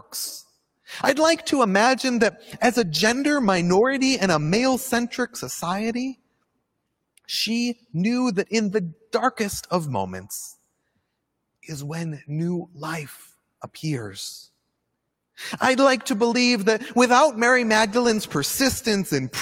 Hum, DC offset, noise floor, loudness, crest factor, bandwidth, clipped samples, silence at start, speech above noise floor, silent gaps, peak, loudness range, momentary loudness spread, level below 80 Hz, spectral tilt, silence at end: none; under 0.1%; -77 dBFS; -22 LUFS; 20 dB; 17 kHz; under 0.1%; 0.1 s; 55 dB; none; -4 dBFS; 12 LU; 15 LU; -58 dBFS; -4 dB/octave; 0 s